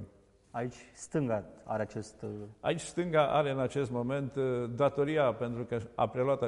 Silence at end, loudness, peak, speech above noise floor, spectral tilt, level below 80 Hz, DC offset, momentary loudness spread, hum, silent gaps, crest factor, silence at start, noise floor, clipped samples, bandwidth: 0 s; -33 LUFS; -14 dBFS; 28 dB; -6.5 dB/octave; -62 dBFS; under 0.1%; 13 LU; none; none; 18 dB; 0 s; -60 dBFS; under 0.1%; 11.5 kHz